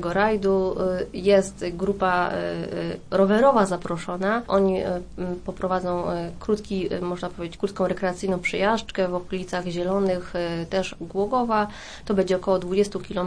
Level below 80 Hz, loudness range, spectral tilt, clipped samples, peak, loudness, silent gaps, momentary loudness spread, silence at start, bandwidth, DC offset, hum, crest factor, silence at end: -46 dBFS; 4 LU; -6 dB/octave; under 0.1%; -6 dBFS; -24 LUFS; none; 9 LU; 0 s; 10.5 kHz; under 0.1%; none; 18 dB; 0 s